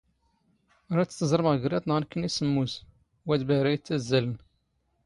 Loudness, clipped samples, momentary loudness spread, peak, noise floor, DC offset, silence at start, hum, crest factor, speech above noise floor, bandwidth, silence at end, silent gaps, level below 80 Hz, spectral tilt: -27 LUFS; under 0.1%; 9 LU; -8 dBFS; -73 dBFS; under 0.1%; 0.9 s; none; 20 dB; 47 dB; 11.5 kHz; 0.7 s; none; -60 dBFS; -6 dB/octave